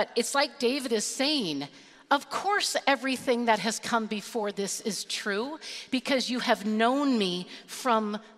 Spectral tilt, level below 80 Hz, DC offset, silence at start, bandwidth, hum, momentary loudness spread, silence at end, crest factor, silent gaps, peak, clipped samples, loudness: -3 dB/octave; -76 dBFS; under 0.1%; 0 s; 15.5 kHz; none; 7 LU; 0.05 s; 20 dB; none; -8 dBFS; under 0.1%; -28 LUFS